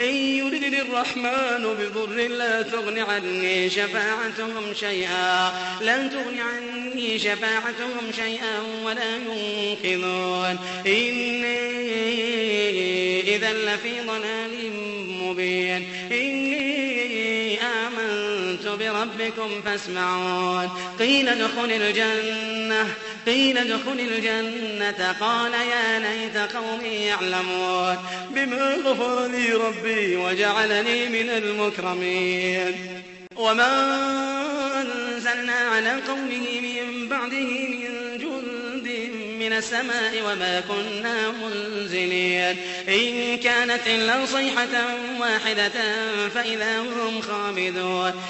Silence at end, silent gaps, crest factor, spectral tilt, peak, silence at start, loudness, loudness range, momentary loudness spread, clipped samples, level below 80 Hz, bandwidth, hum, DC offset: 0 s; none; 18 dB; -3 dB/octave; -6 dBFS; 0 s; -23 LUFS; 4 LU; 7 LU; under 0.1%; -66 dBFS; 8.4 kHz; none; under 0.1%